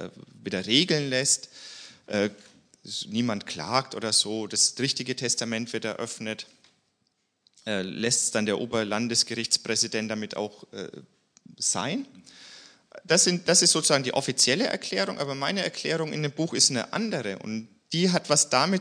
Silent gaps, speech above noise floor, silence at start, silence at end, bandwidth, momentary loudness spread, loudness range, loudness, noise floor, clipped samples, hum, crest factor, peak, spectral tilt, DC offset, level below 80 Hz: none; 48 dB; 0 s; 0 s; 10.5 kHz; 15 LU; 7 LU; -25 LUFS; -74 dBFS; under 0.1%; none; 22 dB; -4 dBFS; -2.5 dB/octave; under 0.1%; -74 dBFS